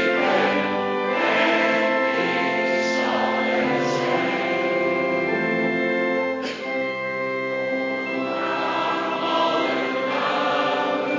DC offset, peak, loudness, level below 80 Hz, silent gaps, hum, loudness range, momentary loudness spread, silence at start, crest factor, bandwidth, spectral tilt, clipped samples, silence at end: under 0.1%; -8 dBFS; -22 LUFS; -64 dBFS; none; none; 4 LU; 6 LU; 0 s; 14 dB; 7.6 kHz; -5 dB/octave; under 0.1%; 0 s